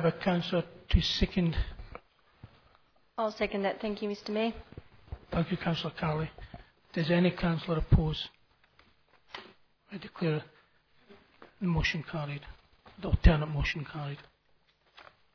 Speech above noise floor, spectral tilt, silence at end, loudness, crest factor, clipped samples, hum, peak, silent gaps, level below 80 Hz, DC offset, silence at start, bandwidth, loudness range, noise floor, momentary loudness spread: 39 dB; -7 dB/octave; 1.15 s; -31 LUFS; 26 dB; under 0.1%; none; -6 dBFS; none; -38 dBFS; under 0.1%; 0 s; 5.4 kHz; 5 LU; -69 dBFS; 20 LU